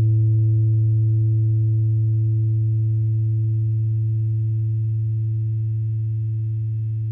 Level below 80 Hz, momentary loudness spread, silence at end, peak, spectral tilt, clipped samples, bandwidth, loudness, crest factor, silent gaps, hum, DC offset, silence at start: -48 dBFS; 6 LU; 0 s; -12 dBFS; -13.5 dB/octave; under 0.1%; 0.6 kHz; -21 LUFS; 6 dB; none; none; under 0.1%; 0 s